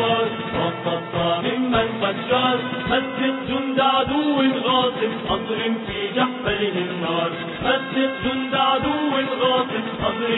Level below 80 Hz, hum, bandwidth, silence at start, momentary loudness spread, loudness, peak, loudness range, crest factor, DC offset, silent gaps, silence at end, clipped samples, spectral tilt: -48 dBFS; none; 4.1 kHz; 0 s; 5 LU; -21 LUFS; -6 dBFS; 2 LU; 16 dB; under 0.1%; none; 0 s; under 0.1%; -8.5 dB/octave